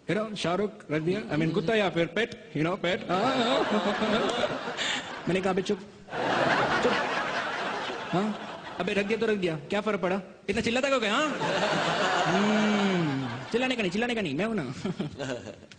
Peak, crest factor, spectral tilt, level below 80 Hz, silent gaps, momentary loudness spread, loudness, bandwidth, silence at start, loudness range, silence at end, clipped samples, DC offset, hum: -12 dBFS; 16 dB; -5 dB/octave; -60 dBFS; none; 8 LU; -28 LUFS; 10 kHz; 0.05 s; 3 LU; 0.05 s; under 0.1%; under 0.1%; none